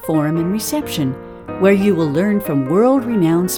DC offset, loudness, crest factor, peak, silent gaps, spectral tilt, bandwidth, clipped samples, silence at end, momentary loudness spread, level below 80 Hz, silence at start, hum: under 0.1%; -16 LUFS; 14 dB; -2 dBFS; none; -6 dB/octave; over 20 kHz; under 0.1%; 0 s; 8 LU; -48 dBFS; 0 s; none